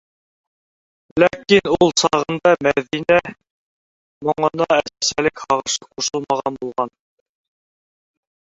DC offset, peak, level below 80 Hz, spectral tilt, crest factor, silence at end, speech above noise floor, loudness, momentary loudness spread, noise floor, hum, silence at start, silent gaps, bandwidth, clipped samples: under 0.1%; -2 dBFS; -54 dBFS; -3.5 dB/octave; 18 dB; 1.6 s; over 72 dB; -18 LUFS; 10 LU; under -90 dBFS; none; 1.15 s; 3.51-4.21 s; 8 kHz; under 0.1%